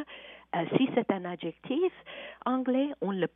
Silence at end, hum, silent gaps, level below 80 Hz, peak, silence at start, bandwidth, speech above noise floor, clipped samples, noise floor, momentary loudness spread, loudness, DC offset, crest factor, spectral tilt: 0.05 s; none; none; -72 dBFS; -10 dBFS; 0 s; 3.9 kHz; 19 dB; under 0.1%; -49 dBFS; 16 LU; -31 LUFS; under 0.1%; 20 dB; -5 dB/octave